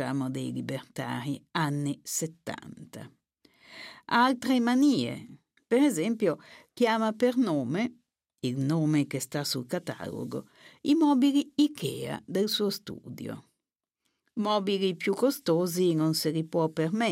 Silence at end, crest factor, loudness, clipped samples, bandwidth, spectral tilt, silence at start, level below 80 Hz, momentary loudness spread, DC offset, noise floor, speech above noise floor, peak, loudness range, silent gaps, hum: 0 s; 18 dB; -28 LUFS; under 0.1%; 16 kHz; -5 dB/octave; 0 s; -76 dBFS; 16 LU; under 0.1%; -88 dBFS; 60 dB; -12 dBFS; 5 LU; none; none